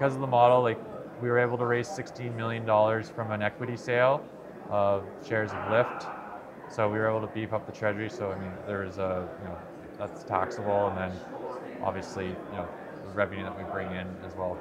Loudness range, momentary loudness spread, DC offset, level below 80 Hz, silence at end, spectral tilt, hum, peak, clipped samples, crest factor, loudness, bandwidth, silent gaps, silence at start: 6 LU; 14 LU; under 0.1%; -64 dBFS; 0 s; -6.5 dB/octave; none; -8 dBFS; under 0.1%; 20 dB; -30 LUFS; 11 kHz; none; 0 s